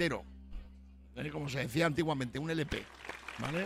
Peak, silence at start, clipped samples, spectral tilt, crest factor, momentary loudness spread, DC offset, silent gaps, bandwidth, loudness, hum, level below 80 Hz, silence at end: -18 dBFS; 0 s; under 0.1%; -5.5 dB/octave; 18 dB; 20 LU; under 0.1%; none; 16 kHz; -36 LUFS; none; -52 dBFS; 0 s